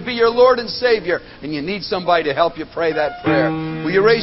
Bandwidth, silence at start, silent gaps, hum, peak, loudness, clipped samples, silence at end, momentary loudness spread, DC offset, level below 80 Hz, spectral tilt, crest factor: 6 kHz; 0 s; none; none; -2 dBFS; -18 LUFS; under 0.1%; 0 s; 10 LU; under 0.1%; -48 dBFS; -8 dB/octave; 16 dB